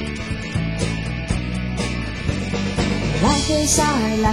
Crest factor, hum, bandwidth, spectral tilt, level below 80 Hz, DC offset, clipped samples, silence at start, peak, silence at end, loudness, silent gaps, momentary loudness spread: 16 dB; none; 16 kHz; -4.5 dB/octave; -30 dBFS; under 0.1%; under 0.1%; 0 s; -4 dBFS; 0 s; -21 LUFS; none; 8 LU